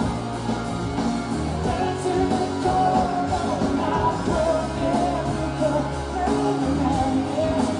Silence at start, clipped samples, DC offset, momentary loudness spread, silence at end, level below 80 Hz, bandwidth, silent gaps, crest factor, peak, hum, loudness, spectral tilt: 0 s; under 0.1%; under 0.1%; 5 LU; 0 s; -38 dBFS; 10.5 kHz; none; 14 dB; -8 dBFS; none; -23 LUFS; -6.5 dB/octave